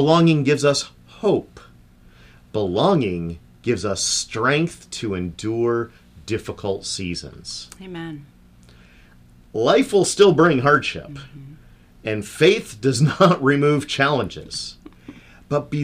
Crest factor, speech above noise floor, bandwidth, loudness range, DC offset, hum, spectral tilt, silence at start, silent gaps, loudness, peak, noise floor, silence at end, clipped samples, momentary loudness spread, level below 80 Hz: 18 dB; 29 dB; 15.5 kHz; 8 LU; under 0.1%; 60 Hz at -50 dBFS; -5 dB/octave; 0 s; none; -20 LUFS; -2 dBFS; -49 dBFS; 0 s; under 0.1%; 18 LU; -50 dBFS